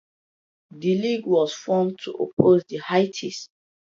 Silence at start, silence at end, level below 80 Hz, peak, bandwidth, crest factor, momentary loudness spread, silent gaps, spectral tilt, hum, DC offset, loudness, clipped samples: 0.75 s; 0.55 s; -64 dBFS; 0 dBFS; 7.6 kHz; 22 dB; 12 LU; 2.33-2.37 s; -6 dB/octave; none; under 0.1%; -22 LUFS; under 0.1%